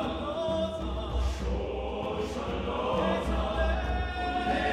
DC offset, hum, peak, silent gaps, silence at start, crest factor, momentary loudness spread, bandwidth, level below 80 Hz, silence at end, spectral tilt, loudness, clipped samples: under 0.1%; none; -16 dBFS; none; 0 s; 14 dB; 5 LU; 10 kHz; -36 dBFS; 0 s; -6.5 dB/octave; -31 LUFS; under 0.1%